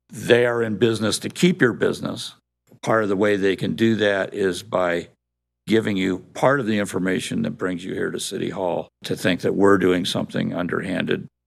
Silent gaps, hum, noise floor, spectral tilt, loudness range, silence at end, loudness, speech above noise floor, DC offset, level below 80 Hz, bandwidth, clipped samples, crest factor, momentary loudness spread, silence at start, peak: none; none; -81 dBFS; -5 dB/octave; 2 LU; 0.2 s; -22 LUFS; 59 dB; under 0.1%; -62 dBFS; 14.5 kHz; under 0.1%; 20 dB; 9 LU; 0.1 s; -2 dBFS